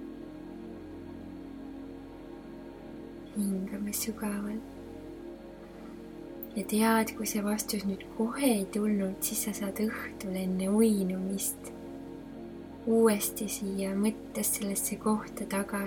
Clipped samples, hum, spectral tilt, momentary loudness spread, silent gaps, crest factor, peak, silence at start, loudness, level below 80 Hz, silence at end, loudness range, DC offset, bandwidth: under 0.1%; none; -4.5 dB/octave; 19 LU; none; 18 dB; -14 dBFS; 0 s; -31 LUFS; -58 dBFS; 0 s; 8 LU; under 0.1%; 19 kHz